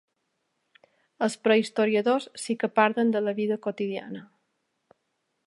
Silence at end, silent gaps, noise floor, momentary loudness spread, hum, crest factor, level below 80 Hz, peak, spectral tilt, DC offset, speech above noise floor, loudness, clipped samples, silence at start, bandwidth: 1.2 s; none; -77 dBFS; 10 LU; none; 22 dB; -82 dBFS; -6 dBFS; -5 dB/octave; under 0.1%; 52 dB; -26 LUFS; under 0.1%; 1.2 s; 11.5 kHz